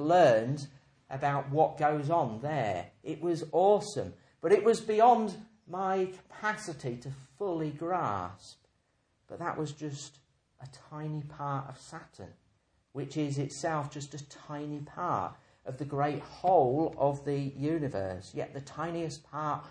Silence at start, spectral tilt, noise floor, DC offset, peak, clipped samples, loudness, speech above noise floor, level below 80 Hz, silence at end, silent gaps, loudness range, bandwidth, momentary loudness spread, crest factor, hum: 0 s; -6.5 dB/octave; -74 dBFS; under 0.1%; -12 dBFS; under 0.1%; -31 LUFS; 43 dB; -68 dBFS; 0 s; none; 12 LU; 10.5 kHz; 19 LU; 20 dB; none